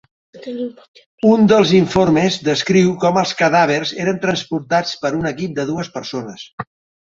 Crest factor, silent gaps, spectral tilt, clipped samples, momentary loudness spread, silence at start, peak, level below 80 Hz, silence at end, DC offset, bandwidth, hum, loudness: 16 dB; 0.88-0.94 s, 1.06-1.18 s, 6.53-6.58 s; -5.5 dB/octave; under 0.1%; 18 LU; 0.35 s; 0 dBFS; -50 dBFS; 0.4 s; under 0.1%; 7.8 kHz; none; -16 LUFS